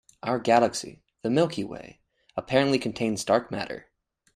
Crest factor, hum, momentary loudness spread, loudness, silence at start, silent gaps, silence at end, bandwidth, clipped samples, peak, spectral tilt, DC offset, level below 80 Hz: 22 dB; none; 15 LU; -26 LUFS; 0.25 s; none; 0.55 s; 14 kHz; under 0.1%; -6 dBFS; -5 dB/octave; under 0.1%; -62 dBFS